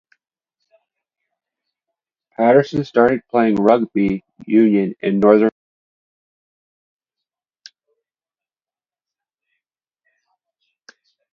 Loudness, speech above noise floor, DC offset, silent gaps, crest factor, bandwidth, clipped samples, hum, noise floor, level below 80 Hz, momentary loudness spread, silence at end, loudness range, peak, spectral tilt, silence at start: -16 LUFS; over 75 dB; under 0.1%; none; 20 dB; 7 kHz; under 0.1%; none; under -90 dBFS; -58 dBFS; 7 LU; 5.85 s; 5 LU; 0 dBFS; -8.5 dB/octave; 2.4 s